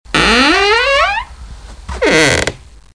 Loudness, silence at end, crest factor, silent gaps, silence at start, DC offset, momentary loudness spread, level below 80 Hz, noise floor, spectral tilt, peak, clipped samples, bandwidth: -11 LUFS; 0.4 s; 14 dB; none; 0.1 s; under 0.1%; 12 LU; -30 dBFS; -31 dBFS; -3 dB/octave; 0 dBFS; under 0.1%; 10.5 kHz